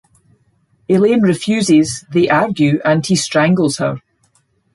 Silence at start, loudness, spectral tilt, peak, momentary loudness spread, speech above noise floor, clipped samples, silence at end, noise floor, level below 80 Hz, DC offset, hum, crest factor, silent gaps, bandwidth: 0.9 s; -14 LUFS; -5.5 dB/octave; -2 dBFS; 5 LU; 46 dB; under 0.1%; 0.75 s; -59 dBFS; -54 dBFS; under 0.1%; none; 14 dB; none; 11.5 kHz